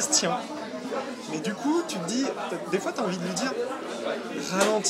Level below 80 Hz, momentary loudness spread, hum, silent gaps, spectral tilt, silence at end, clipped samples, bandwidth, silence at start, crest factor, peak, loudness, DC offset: -74 dBFS; 9 LU; none; none; -3 dB/octave; 0 s; under 0.1%; 16 kHz; 0 s; 20 dB; -8 dBFS; -29 LUFS; under 0.1%